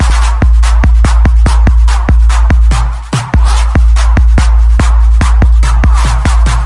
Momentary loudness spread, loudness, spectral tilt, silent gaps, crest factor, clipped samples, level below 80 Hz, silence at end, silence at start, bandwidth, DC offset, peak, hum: 2 LU; -9 LUFS; -5.5 dB/octave; none; 6 dB; under 0.1%; -6 dBFS; 0 s; 0 s; 11 kHz; under 0.1%; 0 dBFS; none